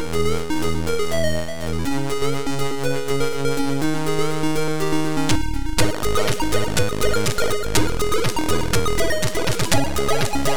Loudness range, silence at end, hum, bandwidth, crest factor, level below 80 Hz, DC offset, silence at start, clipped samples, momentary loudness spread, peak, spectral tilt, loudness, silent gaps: 2 LU; 0 s; none; over 20 kHz; 16 dB; -34 dBFS; 10%; 0 s; under 0.1%; 3 LU; -4 dBFS; -4.5 dB/octave; -22 LUFS; none